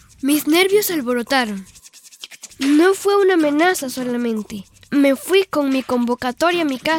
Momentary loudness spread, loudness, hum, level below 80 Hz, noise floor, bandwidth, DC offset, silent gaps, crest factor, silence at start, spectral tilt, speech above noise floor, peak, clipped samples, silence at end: 16 LU; -17 LUFS; none; -58 dBFS; -41 dBFS; 18.5 kHz; under 0.1%; none; 16 dB; 0.25 s; -3 dB/octave; 23 dB; -2 dBFS; under 0.1%; 0 s